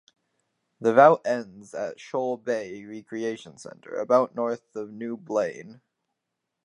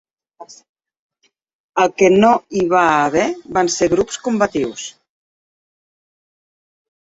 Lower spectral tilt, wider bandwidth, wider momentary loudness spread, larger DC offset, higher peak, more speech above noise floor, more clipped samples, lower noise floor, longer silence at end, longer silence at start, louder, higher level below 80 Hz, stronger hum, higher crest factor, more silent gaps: first, -6 dB/octave vs -4.5 dB/octave; first, 10.5 kHz vs 8 kHz; first, 21 LU vs 11 LU; neither; about the same, -2 dBFS vs 0 dBFS; first, 57 dB vs 27 dB; neither; first, -83 dBFS vs -42 dBFS; second, 0.9 s vs 2.1 s; first, 0.8 s vs 0.4 s; second, -25 LUFS vs -16 LUFS; second, -78 dBFS vs -52 dBFS; neither; first, 24 dB vs 18 dB; second, none vs 0.69-0.76 s, 0.99-1.10 s, 1.53-1.73 s